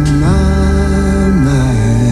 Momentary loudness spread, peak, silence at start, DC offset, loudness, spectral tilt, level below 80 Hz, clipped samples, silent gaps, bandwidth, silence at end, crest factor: 1 LU; -2 dBFS; 0 s; under 0.1%; -12 LUFS; -7 dB/octave; -16 dBFS; under 0.1%; none; 12 kHz; 0 s; 8 dB